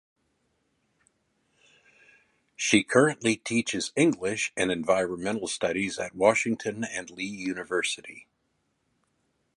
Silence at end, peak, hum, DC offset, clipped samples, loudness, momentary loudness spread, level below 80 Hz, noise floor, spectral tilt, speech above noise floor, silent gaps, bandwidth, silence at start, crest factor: 1.35 s; -6 dBFS; none; under 0.1%; under 0.1%; -27 LUFS; 11 LU; -66 dBFS; -75 dBFS; -3.5 dB/octave; 48 dB; none; 11.5 kHz; 2.6 s; 24 dB